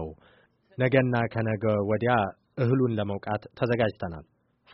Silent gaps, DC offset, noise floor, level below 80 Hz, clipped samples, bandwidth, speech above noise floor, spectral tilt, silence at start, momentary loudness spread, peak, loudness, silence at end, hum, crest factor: none; under 0.1%; -61 dBFS; -56 dBFS; under 0.1%; 5.8 kHz; 35 dB; -6.5 dB/octave; 0 s; 14 LU; -8 dBFS; -27 LUFS; 0.5 s; none; 20 dB